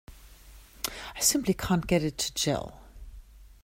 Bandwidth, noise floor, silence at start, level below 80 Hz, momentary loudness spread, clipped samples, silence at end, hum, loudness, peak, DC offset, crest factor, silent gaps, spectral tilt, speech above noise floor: 16 kHz; -51 dBFS; 0.1 s; -48 dBFS; 11 LU; under 0.1%; 0.15 s; none; -28 LUFS; -10 dBFS; under 0.1%; 22 dB; none; -3.5 dB/octave; 24 dB